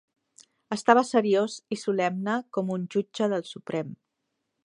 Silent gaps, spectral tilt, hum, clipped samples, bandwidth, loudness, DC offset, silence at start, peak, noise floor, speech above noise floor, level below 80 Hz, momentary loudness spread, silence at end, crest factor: none; -5.5 dB/octave; none; under 0.1%; 11 kHz; -27 LUFS; under 0.1%; 0.7 s; -4 dBFS; -80 dBFS; 54 dB; -78 dBFS; 12 LU; 0.7 s; 24 dB